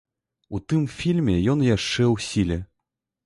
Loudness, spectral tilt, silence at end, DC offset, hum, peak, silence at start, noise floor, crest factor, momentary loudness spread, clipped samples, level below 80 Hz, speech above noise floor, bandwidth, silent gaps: -23 LUFS; -6 dB/octave; 0.6 s; under 0.1%; none; -10 dBFS; 0.5 s; -82 dBFS; 14 dB; 10 LU; under 0.1%; -42 dBFS; 61 dB; 11.5 kHz; none